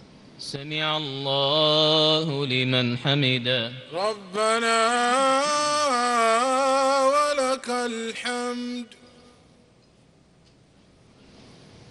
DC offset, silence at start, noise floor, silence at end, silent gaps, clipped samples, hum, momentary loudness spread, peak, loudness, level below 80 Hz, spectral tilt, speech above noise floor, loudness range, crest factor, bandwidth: under 0.1%; 0 s; -57 dBFS; 0.15 s; none; under 0.1%; none; 11 LU; -6 dBFS; -22 LUFS; -66 dBFS; -3.5 dB/octave; 33 dB; 12 LU; 18 dB; 11.5 kHz